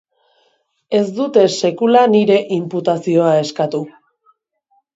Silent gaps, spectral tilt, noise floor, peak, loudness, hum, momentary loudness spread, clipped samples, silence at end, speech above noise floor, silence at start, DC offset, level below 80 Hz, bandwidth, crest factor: none; -6 dB/octave; -62 dBFS; 0 dBFS; -15 LUFS; none; 9 LU; under 0.1%; 1.05 s; 48 dB; 0.9 s; under 0.1%; -68 dBFS; 8 kHz; 16 dB